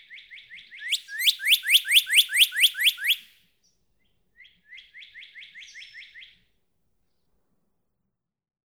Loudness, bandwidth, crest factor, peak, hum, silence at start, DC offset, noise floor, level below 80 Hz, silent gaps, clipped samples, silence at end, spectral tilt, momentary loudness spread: -19 LUFS; over 20 kHz; 22 dB; -6 dBFS; none; 0.1 s; under 0.1%; -82 dBFS; -80 dBFS; none; under 0.1%; 2.4 s; 7 dB/octave; 26 LU